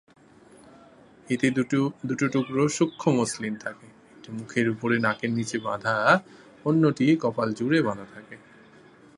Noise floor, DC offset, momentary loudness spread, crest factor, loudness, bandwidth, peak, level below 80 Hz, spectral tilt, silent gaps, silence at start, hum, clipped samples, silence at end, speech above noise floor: -53 dBFS; under 0.1%; 12 LU; 22 dB; -25 LUFS; 11.5 kHz; -4 dBFS; -66 dBFS; -5.5 dB/octave; none; 1.3 s; none; under 0.1%; 0.8 s; 28 dB